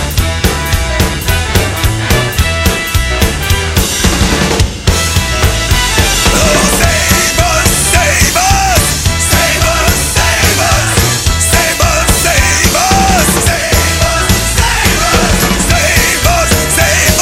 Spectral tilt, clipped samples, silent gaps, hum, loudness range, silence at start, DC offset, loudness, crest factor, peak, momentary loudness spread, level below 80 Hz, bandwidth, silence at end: -3 dB/octave; 0.2%; none; none; 3 LU; 0 s; under 0.1%; -9 LUFS; 10 dB; 0 dBFS; 4 LU; -16 dBFS; 16.5 kHz; 0 s